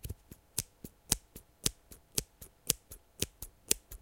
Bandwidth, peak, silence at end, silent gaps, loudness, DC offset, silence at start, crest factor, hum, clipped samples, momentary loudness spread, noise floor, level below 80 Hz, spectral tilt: 17 kHz; 0 dBFS; 0.05 s; none; -36 LUFS; under 0.1%; 0.05 s; 40 dB; none; under 0.1%; 20 LU; -54 dBFS; -52 dBFS; -1.5 dB/octave